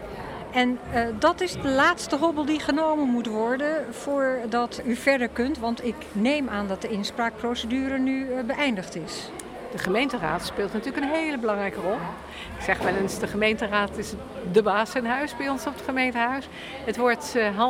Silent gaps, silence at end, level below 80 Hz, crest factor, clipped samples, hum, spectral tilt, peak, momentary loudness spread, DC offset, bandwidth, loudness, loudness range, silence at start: none; 0 s; -50 dBFS; 18 dB; under 0.1%; none; -4.5 dB/octave; -8 dBFS; 9 LU; under 0.1%; 16 kHz; -26 LUFS; 4 LU; 0 s